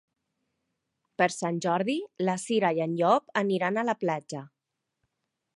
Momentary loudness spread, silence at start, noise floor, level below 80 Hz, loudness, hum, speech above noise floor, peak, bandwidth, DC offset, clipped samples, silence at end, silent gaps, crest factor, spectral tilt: 8 LU; 1.2 s; -81 dBFS; -82 dBFS; -27 LUFS; none; 54 dB; -10 dBFS; 11.5 kHz; under 0.1%; under 0.1%; 1.1 s; none; 20 dB; -5 dB/octave